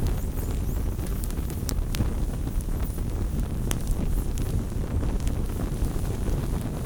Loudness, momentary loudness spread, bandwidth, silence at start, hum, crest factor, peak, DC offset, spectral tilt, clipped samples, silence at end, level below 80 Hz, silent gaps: -30 LUFS; 2 LU; over 20 kHz; 0 s; none; 22 dB; -4 dBFS; under 0.1%; -6 dB/octave; under 0.1%; 0 s; -28 dBFS; none